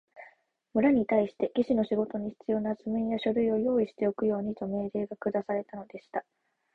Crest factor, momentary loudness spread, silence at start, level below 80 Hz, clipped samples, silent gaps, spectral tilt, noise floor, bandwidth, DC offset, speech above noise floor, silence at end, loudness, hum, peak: 18 dB; 11 LU; 0.15 s; -64 dBFS; under 0.1%; none; -9 dB/octave; -61 dBFS; 4.8 kHz; under 0.1%; 33 dB; 0.55 s; -30 LUFS; none; -12 dBFS